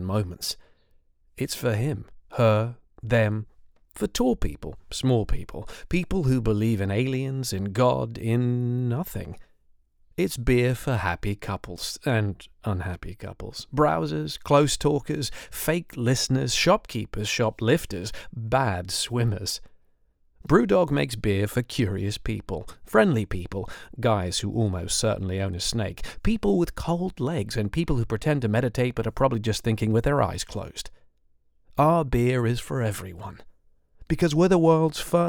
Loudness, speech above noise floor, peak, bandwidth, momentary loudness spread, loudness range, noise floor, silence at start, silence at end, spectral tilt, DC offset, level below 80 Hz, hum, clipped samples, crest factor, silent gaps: -25 LUFS; 38 dB; -4 dBFS; 19.5 kHz; 13 LU; 3 LU; -63 dBFS; 0 s; 0 s; -5.5 dB/octave; under 0.1%; -40 dBFS; none; under 0.1%; 20 dB; none